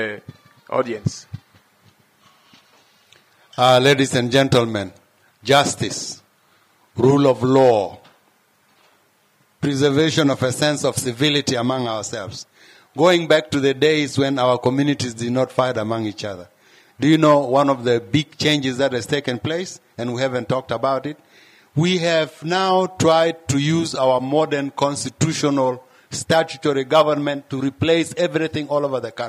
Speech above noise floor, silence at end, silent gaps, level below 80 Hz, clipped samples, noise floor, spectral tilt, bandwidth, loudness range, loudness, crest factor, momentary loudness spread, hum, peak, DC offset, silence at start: 41 dB; 0 s; none; -62 dBFS; under 0.1%; -60 dBFS; -5 dB/octave; 15.5 kHz; 3 LU; -19 LUFS; 16 dB; 14 LU; none; -4 dBFS; under 0.1%; 0 s